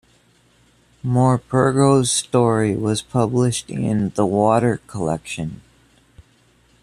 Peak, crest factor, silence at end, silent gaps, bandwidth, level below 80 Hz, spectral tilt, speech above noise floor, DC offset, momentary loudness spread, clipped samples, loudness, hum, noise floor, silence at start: -2 dBFS; 16 dB; 1.25 s; none; 14.5 kHz; -50 dBFS; -5.5 dB/octave; 38 dB; under 0.1%; 9 LU; under 0.1%; -19 LUFS; none; -57 dBFS; 1.05 s